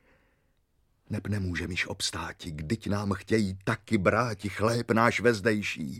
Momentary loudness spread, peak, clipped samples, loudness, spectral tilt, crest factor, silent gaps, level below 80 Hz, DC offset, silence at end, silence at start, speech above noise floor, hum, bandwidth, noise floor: 10 LU; -6 dBFS; under 0.1%; -28 LUFS; -5.5 dB/octave; 22 dB; none; -54 dBFS; under 0.1%; 0 s; 1.1 s; 42 dB; none; 15.5 kHz; -70 dBFS